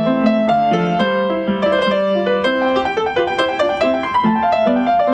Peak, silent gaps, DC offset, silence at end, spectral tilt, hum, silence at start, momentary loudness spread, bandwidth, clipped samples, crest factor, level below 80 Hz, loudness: -4 dBFS; none; under 0.1%; 0 s; -6.5 dB/octave; none; 0 s; 3 LU; 9 kHz; under 0.1%; 12 dB; -48 dBFS; -16 LUFS